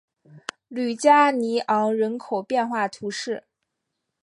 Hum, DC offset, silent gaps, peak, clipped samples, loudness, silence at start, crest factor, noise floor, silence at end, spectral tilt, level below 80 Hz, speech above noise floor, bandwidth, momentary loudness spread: none; under 0.1%; none; -4 dBFS; under 0.1%; -22 LUFS; 0.35 s; 20 dB; -80 dBFS; 0.85 s; -4 dB/octave; -78 dBFS; 58 dB; 11.5 kHz; 17 LU